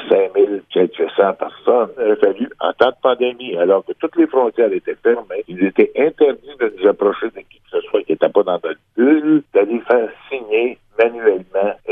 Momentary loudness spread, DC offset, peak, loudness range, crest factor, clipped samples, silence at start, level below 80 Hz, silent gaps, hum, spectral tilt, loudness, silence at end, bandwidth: 7 LU; under 0.1%; 0 dBFS; 1 LU; 16 dB; under 0.1%; 0 s; -62 dBFS; none; none; -8 dB/octave; -17 LUFS; 0 s; 4.4 kHz